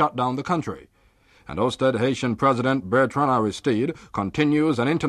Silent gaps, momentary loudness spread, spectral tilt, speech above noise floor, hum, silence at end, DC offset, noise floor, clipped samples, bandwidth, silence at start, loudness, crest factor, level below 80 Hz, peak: none; 7 LU; -6.5 dB/octave; 36 dB; none; 0 s; under 0.1%; -58 dBFS; under 0.1%; 11.5 kHz; 0 s; -22 LUFS; 16 dB; -54 dBFS; -8 dBFS